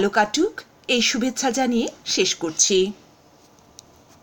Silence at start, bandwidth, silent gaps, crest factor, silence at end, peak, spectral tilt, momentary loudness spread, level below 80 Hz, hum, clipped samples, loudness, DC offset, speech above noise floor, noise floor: 0 s; 17 kHz; none; 18 dB; 1.3 s; -4 dBFS; -2 dB/octave; 7 LU; -56 dBFS; none; under 0.1%; -21 LUFS; under 0.1%; 32 dB; -53 dBFS